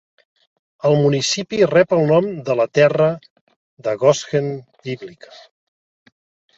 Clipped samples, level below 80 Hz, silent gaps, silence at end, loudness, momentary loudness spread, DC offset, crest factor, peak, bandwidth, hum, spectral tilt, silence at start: under 0.1%; -60 dBFS; 3.30-3.47 s, 3.56-3.77 s; 1.45 s; -17 LUFS; 15 LU; under 0.1%; 18 dB; -2 dBFS; 8 kHz; none; -5 dB/octave; 0.85 s